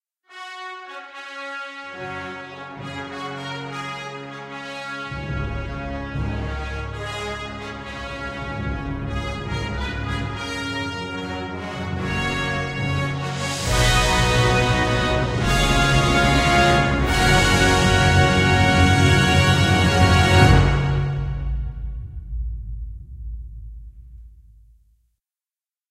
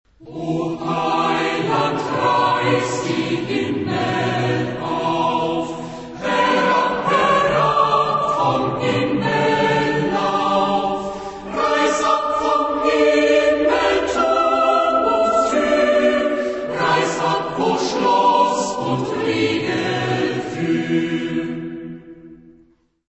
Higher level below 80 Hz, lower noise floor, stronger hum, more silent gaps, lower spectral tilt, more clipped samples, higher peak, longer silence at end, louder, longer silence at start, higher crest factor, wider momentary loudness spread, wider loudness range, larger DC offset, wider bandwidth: first, -30 dBFS vs -50 dBFS; first, under -90 dBFS vs -55 dBFS; neither; neither; about the same, -5 dB/octave vs -5 dB/octave; neither; about the same, -2 dBFS vs -4 dBFS; first, 1.55 s vs 0.6 s; about the same, -20 LUFS vs -18 LUFS; about the same, 0.3 s vs 0.2 s; first, 20 dB vs 14 dB; first, 18 LU vs 8 LU; first, 16 LU vs 5 LU; neither; first, 15.5 kHz vs 8.4 kHz